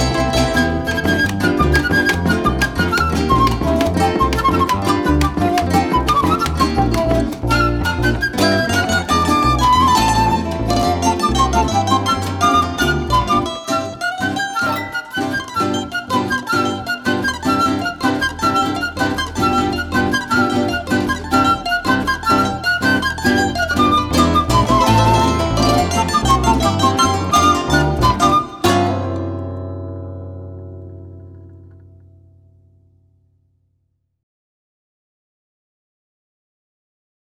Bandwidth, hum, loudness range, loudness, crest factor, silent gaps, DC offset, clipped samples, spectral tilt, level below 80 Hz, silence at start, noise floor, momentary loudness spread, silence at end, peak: 19.5 kHz; none; 5 LU; -16 LUFS; 16 dB; none; under 0.1%; under 0.1%; -5 dB/octave; -30 dBFS; 0 s; -67 dBFS; 7 LU; 5.6 s; -2 dBFS